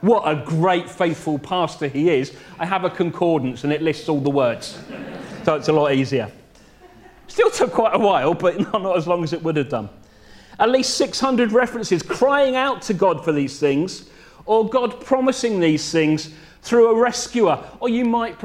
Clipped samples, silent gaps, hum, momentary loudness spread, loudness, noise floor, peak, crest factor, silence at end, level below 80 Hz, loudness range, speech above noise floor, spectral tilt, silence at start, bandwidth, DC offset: under 0.1%; none; none; 9 LU; -20 LUFS; -48 dBFS; -2 dBFS; 18 dB; 0 s; -54 dBFS; 3 LU; 29 dB; -5 dB/octave; 0 s; 13.5 kHz; under 0.1%